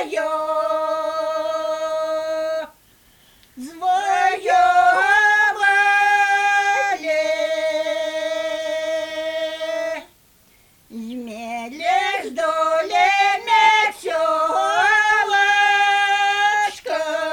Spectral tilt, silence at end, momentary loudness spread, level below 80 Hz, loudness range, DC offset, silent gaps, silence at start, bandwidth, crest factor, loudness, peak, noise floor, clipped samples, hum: -0.5 dB/octave; 0 s; 11 LU; -62 dBFS; 10 LU; under 0.1%; none; 0 s; 19 kHz; 16 dB; -18 LUFS; -4 dBFS; -54 dBFS; under 0.1%; none